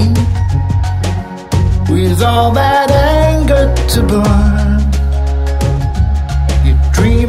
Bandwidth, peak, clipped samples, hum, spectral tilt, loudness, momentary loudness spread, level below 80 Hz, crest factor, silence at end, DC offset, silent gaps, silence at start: 15 kHz; 0 dBFS; under 0.1%; none; -6.5 dB/octave; -12 LUFS; 5 LU; -14 dBFS; 10 dB; 0 s; under 0.1%; none; 0 s